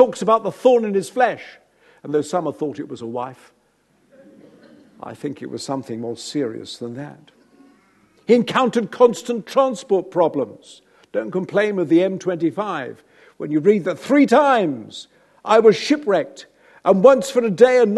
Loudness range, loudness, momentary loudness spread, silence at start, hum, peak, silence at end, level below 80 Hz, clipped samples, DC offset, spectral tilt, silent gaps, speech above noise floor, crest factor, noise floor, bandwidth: 13 LU; -19 LUFS; 18 LU; 0 s; none; 0 dBFS; 0 s; -70 dBFS; under 0.1%; under 0.1%; -5.5 dB/octave; none; 43 dB; 20 dB; -61 dBFS; 12.5 kHz